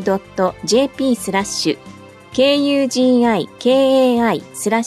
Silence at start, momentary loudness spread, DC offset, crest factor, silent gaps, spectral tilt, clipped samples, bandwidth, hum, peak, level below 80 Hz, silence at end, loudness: 0 s; 7 LU; under 0.1%; 12 dB; none; -4 dB/octave; under 0.1%; 14 kHz; none; -4 dBFS; -54 dBFS; 0 s; -16 LUFS